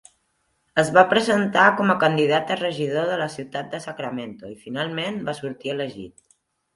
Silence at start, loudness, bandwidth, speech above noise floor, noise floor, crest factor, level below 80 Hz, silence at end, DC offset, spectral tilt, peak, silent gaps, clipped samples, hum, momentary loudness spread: 0.75 s; -22 LUFS; 11.5 kHz; 48 dB; -70 dBFS; 22 dB; -64 dBFS; 0.65 s; under 0.1%; -5 dB/octave; 0 dBFS; none; under 0.1%; none; 16 LU